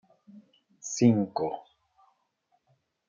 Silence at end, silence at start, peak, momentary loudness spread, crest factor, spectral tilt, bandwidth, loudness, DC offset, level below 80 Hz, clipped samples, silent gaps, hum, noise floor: 1.5 s; 0.35 s; -10 dBFS; 19 LU; 22 dB; -6 dB/octave; 7.6 kHz; -27 LUFS; under 0.1%; -76 dBFS; under 0.1%; none; none; -74 dBFS